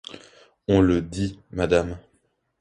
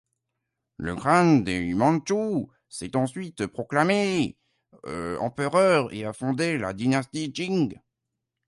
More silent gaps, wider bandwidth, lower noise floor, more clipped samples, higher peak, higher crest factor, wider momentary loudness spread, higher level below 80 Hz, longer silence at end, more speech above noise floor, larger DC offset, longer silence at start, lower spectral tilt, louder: neither; about the same, 10.5 kHz vs 11.5 kHz; second, -69 dBFS vs -83 dBFS; neither; about the same, -4 dBFS vs -6 dBFS; about the same, 20 dB vs 20 dB; first, 18 LU vs 12 LU; first, -42 dBFS vs -56 dBFS; second, 0.6 s vs 0.75 s; second, 47 dB vs 59 dB; neither; second, 0.1 s vs 0.8 s; about the same, -7 dB/octave vs -6 dB/octave; about the same, -23 LUFS vs -25 LUFS